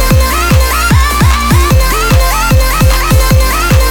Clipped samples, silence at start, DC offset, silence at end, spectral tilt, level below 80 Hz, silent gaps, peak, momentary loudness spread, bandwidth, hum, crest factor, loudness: 0.2%; 0 s; under 0.1%; 0 s; -4.5 dB/octave; -10 dBFS; none; 0 dBFS; 1 LU; over 20 kHz; none; 8 dB; -9 LUFS